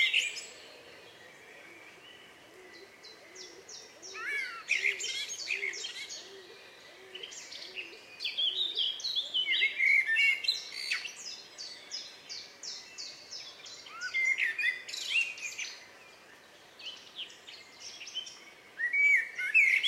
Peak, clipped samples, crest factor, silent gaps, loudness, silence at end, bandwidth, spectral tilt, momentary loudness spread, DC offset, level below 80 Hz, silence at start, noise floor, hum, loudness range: -14 dBFS; under 0.1%; 20 dB; none; -30 LUFS; 0 s; 16 kHz; 2 dB/octave; 25 LU; under 0.1%; -84 dBFS; 0 s; -56 dBFS; none; 14 LU